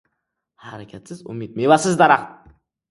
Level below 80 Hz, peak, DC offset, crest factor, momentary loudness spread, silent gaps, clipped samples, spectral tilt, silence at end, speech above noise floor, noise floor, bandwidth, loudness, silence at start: -60 dBFS; 0 dBFS; under 0.1%; 20 dB; 23 LU; none; under 0.1%; -5 dB/octave; 0.6 s; 59 dB; -77 dBFS; 11.5 kHz; -16 LUFS; 0.65 s